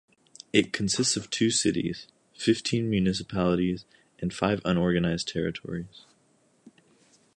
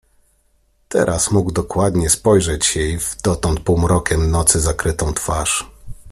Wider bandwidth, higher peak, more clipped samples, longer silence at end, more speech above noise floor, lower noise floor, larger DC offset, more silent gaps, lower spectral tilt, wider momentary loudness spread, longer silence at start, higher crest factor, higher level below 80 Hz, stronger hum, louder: second, 11.5 kHz vs 14.5 kHz; second, -6 dBFS vs 0 dBFS; neither; first, 0.65 s vs 0 s; second, 39 dB vs 43 dB; first, -65 dBFS vs -59 dBFS; neither; neither; about the same, -4.5 dB/octave vs -4.5 dB/octave; first, 11 LU vs 7 LU; second, 0.55 s vs 0.9 s; about the same, 22 dB vs 18 dB; second, -52 dBFS vs -30 dBFS; neither; second, -27 LUFS vs -17 LUFS